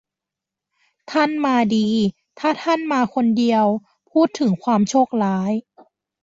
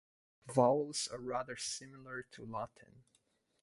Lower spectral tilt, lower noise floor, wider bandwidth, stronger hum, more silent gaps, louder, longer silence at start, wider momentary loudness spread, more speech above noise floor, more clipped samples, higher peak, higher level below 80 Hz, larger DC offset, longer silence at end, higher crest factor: first, -6 dB/octave vs -4 dB/octave; first, -86 dBFS vs -77 dBFS; second, 7.8 kHz vs 11.5 kHz; neither; neither; first, -19 LUFS vs -37 LUFS; first, 1.1 s vs 0.45 s; second, 7 LU vs 16 LU; first, 68 dB vs 39 dB; neither; first, -4 dBFS vs -16 dBFS; first, -62 dBFS vs -74 dBFS; neither; about the same, 0.6 s vs 0.6 s; second, 16 dB vs 24 dB